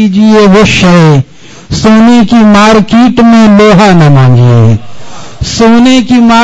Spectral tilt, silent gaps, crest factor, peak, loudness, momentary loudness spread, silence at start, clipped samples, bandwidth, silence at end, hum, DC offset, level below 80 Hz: -6.5 dB/octave; none; 4 dB; 0 dBFS; -3 LUFS; 8 LU; 0 s; 10%; 9.6 kHz; 0 s; none; under 0.1%; -28 dBFS